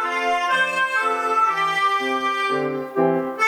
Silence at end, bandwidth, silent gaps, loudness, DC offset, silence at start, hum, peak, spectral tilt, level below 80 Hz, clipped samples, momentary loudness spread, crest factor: 0 s; 18 kHz; none; -20 LUFS; under 0.1%; 0 s; none; -8 dBFS; -3.5 dB/octave; -66 dBFS; under 0.1%; 3 LU; 14 dB